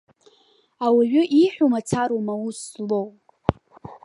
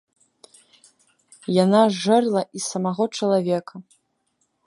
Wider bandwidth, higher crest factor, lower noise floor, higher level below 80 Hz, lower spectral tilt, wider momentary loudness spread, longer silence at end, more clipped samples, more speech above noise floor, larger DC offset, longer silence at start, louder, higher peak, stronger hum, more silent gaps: about the same, 11.5 kHz vs 11.5 kHz; about the same, 22 dB vs 20 dB; second, -60 dBFS vs -71 dBFS; first, -50 dBFS vs -72 dBFS; about the same, -6 dB/octave vs -5.5 dB/octave; first, 14 LU vs 10 LU; second, 0.1 s vs 0.85 s; neither; second, 40 dB vs 51 dB; neither; second, 0.8 s vs 1.5 s; about the same, -22 LUFS vs -21 LUFS; about the same, 0 dBFS vs -2 dBFS; neither; neither